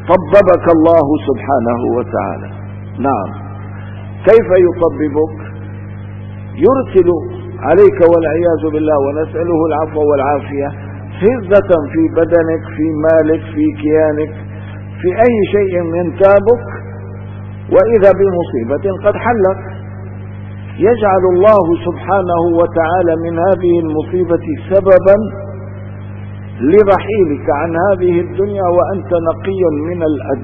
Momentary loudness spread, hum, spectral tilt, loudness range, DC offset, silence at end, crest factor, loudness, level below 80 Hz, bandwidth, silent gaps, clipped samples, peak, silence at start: 19 LU; 50 Hz at -25 dBFS; -10 dB/octave; 3 LU; 0.3%; 0 s; 12 dB; -12 LUFS; -42 dBFS; 4.8 kHz; none; 0.3%; 0 dBFS; 0 s